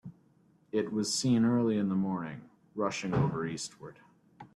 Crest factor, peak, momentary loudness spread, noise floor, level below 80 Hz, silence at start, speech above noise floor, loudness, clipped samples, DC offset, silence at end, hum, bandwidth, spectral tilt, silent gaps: 16 dB; -16 dBFS; 20 LU; -66 dBFS; -64 dBFS; 0.05 s; 35 dB; -31 LUFS; under 0.1%; under 0.1%; 0.1 s; none; 13 kHz; -5.5 dB/octave; none